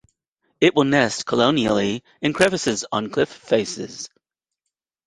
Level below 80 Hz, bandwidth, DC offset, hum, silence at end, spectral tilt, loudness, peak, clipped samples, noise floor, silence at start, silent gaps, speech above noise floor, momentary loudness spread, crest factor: -56 dBFS; 11.5 kHz; under 0.1%; none; 1 s; -4 dB/octave; -20 LUFS; -2 dBFS; under 0.1%; -82 dBFS; 0.6 s; none; 62 dB; 12 LU; 20 dB